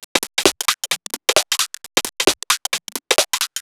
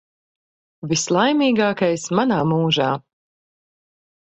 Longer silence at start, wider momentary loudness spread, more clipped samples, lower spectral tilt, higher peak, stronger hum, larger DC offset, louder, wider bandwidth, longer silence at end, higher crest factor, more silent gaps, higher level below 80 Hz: second, 0 s vs 0.85 s; about the same, 5 LU vs 6 LU; neither; second, 0 dB/octave vs -4.5 dB/octave; first, 0 dBFS vs -4 dBFS; neither; neither; about the same, -18 LUFS vs -19 LUFS; first, over 20 kHz vs 8.4 kHz; second, 0 s vs 1.35 s; about the same, 20 dB vs 18 dB; first, 0.04-0.15 s vs none; first, -52 dBFS vs -60 dBFS